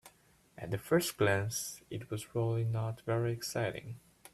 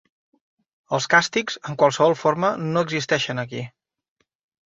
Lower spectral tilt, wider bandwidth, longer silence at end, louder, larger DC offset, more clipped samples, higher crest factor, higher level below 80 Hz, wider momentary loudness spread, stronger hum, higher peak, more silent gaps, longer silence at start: about the same, -5 dB/octave vs -4 dB/octave; first, 14.5 kHz vs 8 kHz; second, 0.35 s vs 1 s; second, -35 LUFS vs -21 LUFS; neither; neither; about the same, 20 dB vs 22 dB; about the same, -66 dBFS vs -64 dBFS; first, 14 LU vs 11 LU; neither; second, -16 dBFS vs -2 dBFS; neither; second, 0.05 s vs 0.9 s